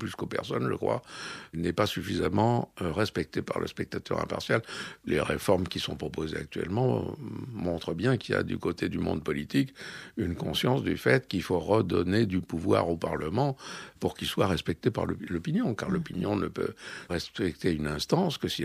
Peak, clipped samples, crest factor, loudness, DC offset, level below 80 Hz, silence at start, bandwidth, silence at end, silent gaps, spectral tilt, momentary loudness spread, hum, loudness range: -10 dBFS; under 0.1%; 20 dB; -30 LUFS; under 0.1%; -52 dBFS; 0 s; 15.5 kHz; 0 s; none; -6 dB/octave; 8 LU; none; 3 LU